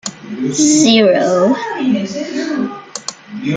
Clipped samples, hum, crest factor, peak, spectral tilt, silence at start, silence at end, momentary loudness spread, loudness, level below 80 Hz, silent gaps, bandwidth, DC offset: under 0.1%; none; 14 dB; 0 dBFS; -3.5 dB/octave; 0.05 s; 0 s; 16 LU; -14 LUFS; -58 dBFS; none; 9.6 kHz; under 0.1%